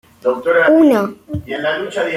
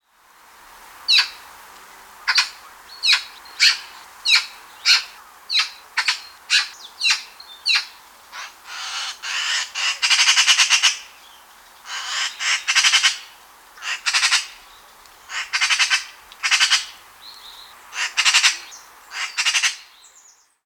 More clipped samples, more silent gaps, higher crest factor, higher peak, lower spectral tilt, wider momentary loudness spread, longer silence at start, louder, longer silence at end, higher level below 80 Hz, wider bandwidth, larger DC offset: neither; neither; second, 14 dB vs 20 dB; about the same, -2 dBFS vs -4 dBFS; first, -6 dB/octave vs 5.5 dB/octave; second, 13 LU vs 21 LU; second, 0.25 s vs 0.8 s; first, -15 LUFS vs -18 LUFS; second, 0 s vs 0.8 s; first, -48 dBFS vs -68 dBFS; second, 14 kHz vs over 20 kHz; neither